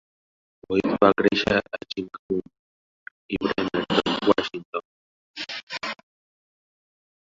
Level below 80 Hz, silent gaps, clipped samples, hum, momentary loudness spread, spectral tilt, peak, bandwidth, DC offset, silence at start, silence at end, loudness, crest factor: -54 dBFS; 2.19-2.29 s, 2.59-3.29 s, 4.65-4.73 s, 4.85-5.34 s, 5.63-5.67 s; under 0.1%; none; 14 LU; -5.5 dB/octave; -2 dBFS; 7.8 kHz; under 0.1%; 0.7 s; 1.45 s; -25 LUFS; 24 dB